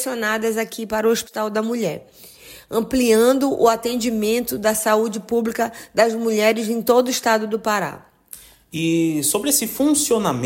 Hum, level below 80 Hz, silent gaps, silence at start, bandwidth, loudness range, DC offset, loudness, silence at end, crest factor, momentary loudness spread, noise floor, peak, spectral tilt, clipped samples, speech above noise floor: none; -54 dBFS; none; 0 s; 16.5 kHz; 2 LU; under 0.1%; -19 LUFS; 0 s; 16 dB; 8 LU; -44 dBFS; -4 dBFS; -3.5 dB/octave; under 0.1%; 24 dB